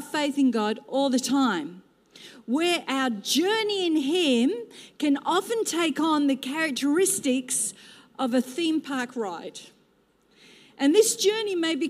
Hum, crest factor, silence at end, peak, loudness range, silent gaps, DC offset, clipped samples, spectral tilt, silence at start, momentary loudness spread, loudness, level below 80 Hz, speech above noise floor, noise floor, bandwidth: none; 18 dB; 0 s; -6 dBFS; 3 LU; none; under 0.1%; under 0.1%; -2.5 dB/octave; 0 s; 10 LU; -25 LUFS; -80 dBFS; 39 dB; -64 dBFS; 15.5 kHz